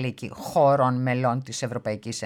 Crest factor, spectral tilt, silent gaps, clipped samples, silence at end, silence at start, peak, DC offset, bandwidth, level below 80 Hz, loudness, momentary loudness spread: 16 dB; -6 dB/octave; none; under 0.1%; 0 s; 0 s; -10 dBFS; under 0.1%; 15.5 kHz; -64 dBFS; -24 LUFS; 11 LU